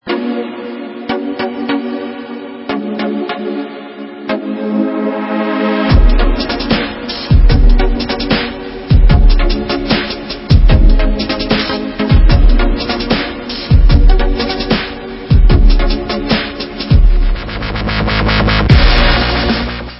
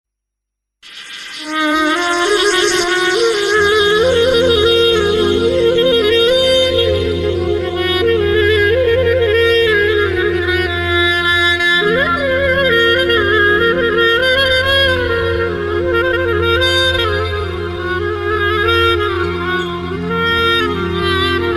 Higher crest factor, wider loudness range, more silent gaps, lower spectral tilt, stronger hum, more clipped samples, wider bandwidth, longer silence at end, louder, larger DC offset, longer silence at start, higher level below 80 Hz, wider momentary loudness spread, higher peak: about the same, 12 dB vs 12 dB; first, 7 LU vs 3 LU; neither; first, -8.5 dB/octave vs -4 dB/octave; neither; first, 0.2% vs under 0.1%; second, 5.8 kHz vs 15 kHz; about the same, 0 s vs 0 s; about the same, -14 LUFS vs -13 LUFS; neither; second, 0.05 s vs 0.85 s; first, -12 dBFS vs -36 dBFS; first, 11 LU vs 7 LU; about the same, 0 dBFS vs -2 dBFS